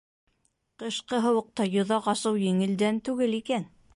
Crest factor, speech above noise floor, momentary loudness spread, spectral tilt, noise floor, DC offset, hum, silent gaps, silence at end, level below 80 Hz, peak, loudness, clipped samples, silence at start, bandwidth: 14 dB; 47 dB; 6 LU; -5.5 dB/octave; -73 dBFS; under 0.1%; none; none; 0.3 s; -70 dBFS; -12 dBFS; -27 LUFS; under 0.1%; 0.8 s; 11.5 kHz